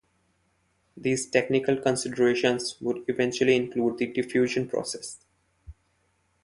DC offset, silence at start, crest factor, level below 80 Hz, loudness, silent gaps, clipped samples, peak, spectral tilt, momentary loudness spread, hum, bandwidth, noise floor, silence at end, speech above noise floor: under 0.1%; 0.95 s; 20 dB; -60 dBFS; -26 LUFS; none; under 0.1%; -6 dBFS; -4.5 dB/octave; 9 LU; none; 11.5 kHz; -70 dBFS; 0.7 s; 45 dB